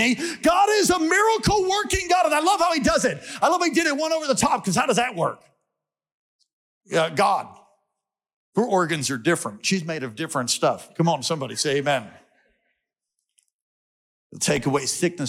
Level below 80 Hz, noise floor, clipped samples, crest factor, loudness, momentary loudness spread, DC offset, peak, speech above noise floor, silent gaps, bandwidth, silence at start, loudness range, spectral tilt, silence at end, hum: -48 dBFS; -83 dBFS; under 0.1%; 14 dB; -22 LUFS; 8 LU; under 0.1%; -10 dBFS; 61 dB; 6.14-6.39 s, 6.53-6.81 s, 8.33-8.53 s, 13.53-14.30 s; 17 kHz; 0 s; 8 LU; -3.5 dB/octave; 0 s; none